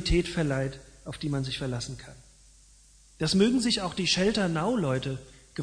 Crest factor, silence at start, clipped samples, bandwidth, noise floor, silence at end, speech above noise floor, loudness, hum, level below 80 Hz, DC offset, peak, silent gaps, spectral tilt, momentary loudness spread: 18 dB; 0 s; under 0.1%; 10.5 kHz; -57 dBFS; 0 s; 29 dB; -28 LUFS; none; -44 dBFS; under 0.1%; -10 dBFS; none; -5 dB/octave; 18 LU